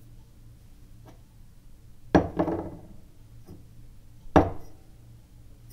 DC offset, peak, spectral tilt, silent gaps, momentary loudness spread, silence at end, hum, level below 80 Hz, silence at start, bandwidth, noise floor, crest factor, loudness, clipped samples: under 0.1%; -4 dBFS; -8 dB/octave; none; 26 LU; 0 s; none; -46 dBFS; 0.15 s; 15.5 kHz; -50 dBFS; 28 dB; -26 LUFS; under 0.1%